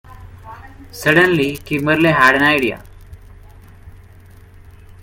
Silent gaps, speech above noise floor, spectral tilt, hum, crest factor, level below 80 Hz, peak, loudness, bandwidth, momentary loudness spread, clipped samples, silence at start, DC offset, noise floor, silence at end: none; 28 dB; -5.5 dB/octave; none; 18 dB; -44 dBFS; 0 dBFS; -14 LUFS; 17 kHz; 26 LU; under 0.1%; 0.1 s; under 0.1%; -42 dBFS; 1.15 s